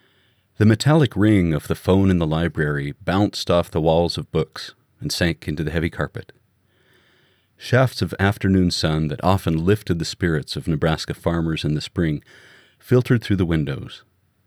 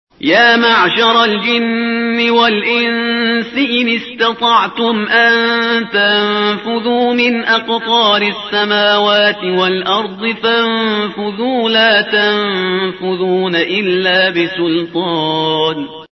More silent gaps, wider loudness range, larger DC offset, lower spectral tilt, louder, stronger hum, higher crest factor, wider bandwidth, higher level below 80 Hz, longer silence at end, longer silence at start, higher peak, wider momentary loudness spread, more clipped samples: neither; first, 5 LU vs 2 LU; neither; first, -6.5 dB/octave vs -5 dB/octave; second, -21 LUFS vs -12 LUFS; neither; about the same, 18 dB vs 14 dB; first, 16 kHz vs 6.2 kHz; first, -40 dBFS vs -58 dBFS; first, 0.5 s vs 0.05 s; first, 0.6 s vs 0.2 s; second, -4 dBFS vs 0 dBFS; first, 10 LU vs 6 LU; neither